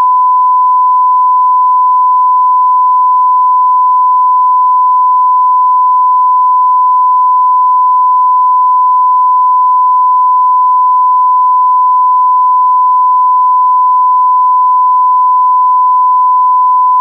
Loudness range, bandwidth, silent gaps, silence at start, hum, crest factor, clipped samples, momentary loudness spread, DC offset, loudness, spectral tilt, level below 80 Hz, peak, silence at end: 0 LU; 1.2 kHz; none; 0 s; none; 4 dB; under 0.1%; 0 LU; under 0.1%; -7 LUFS; -3.5 dB/octave; under -90 dBFS; -4 dBFS; 0 s